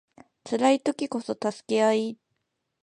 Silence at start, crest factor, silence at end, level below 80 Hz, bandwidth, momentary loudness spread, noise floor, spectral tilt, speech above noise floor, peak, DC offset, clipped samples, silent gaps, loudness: 0.45 s; 18 dB; 0.7 s; -78 dBFS; 10.5 kHz; 9 LU; -79 dBFS; -4.5 dB/octave; 54 dB; -8 dBFS; under 0.1%; under 0.1%; none; -26 LUFS